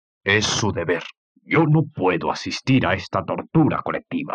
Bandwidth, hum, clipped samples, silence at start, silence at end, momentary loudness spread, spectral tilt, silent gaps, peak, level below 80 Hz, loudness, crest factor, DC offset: 9.4 kHz; none; under 0.1%; 0.25 s; 0 s; 8 LU; -5 dB/octave; 1.17-1.35 s; -6 dBFS; -54 dBFS; -21 LUFS; 16 dB; under 0.1%